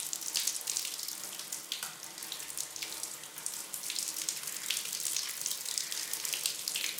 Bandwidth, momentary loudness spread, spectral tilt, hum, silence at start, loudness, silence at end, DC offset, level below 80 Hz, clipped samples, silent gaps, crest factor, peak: 19 kHz; 7 LU; 2 dB/octave; none; 0 s; -35 LUFS; 0 s; under 0.1%; -82 dBFS; under 0.1%; none; 26 dB; -12 dBFS